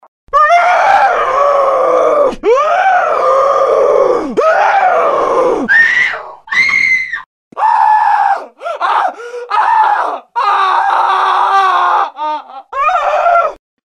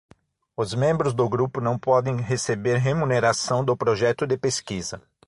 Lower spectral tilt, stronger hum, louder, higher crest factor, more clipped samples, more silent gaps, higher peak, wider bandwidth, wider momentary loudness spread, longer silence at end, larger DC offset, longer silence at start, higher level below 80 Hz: second, -3 dB/octave vs -5 dB/octave; neither; first, -11 LUFS vs -23 LUFS; second, 12 dB vs 18 dB; neither; first, 7.26-7.51 s vs none; first, 0 dBFS vs -6 dBFS; about the same, 11 kHz vs 11.5 kHz; about the same, 9 LU vs 8 LU; about the same, 0.35 s vs 0.3 s; neither; second, 0.35 s vs 0.6 s; first, -48 dBFS vs -54 dBFS